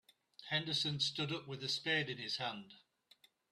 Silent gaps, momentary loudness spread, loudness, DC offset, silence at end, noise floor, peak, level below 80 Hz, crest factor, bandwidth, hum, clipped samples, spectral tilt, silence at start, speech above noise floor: none; 8 LU; -37 LUFS; under 0.1%; 0.75 s; -70 dBFS; -22 dBFS; -78 dBFS; 18 dB; 13.5 kHz; none; under 0.1%; -3.5 dB/octave; 0.4 s; 30 dB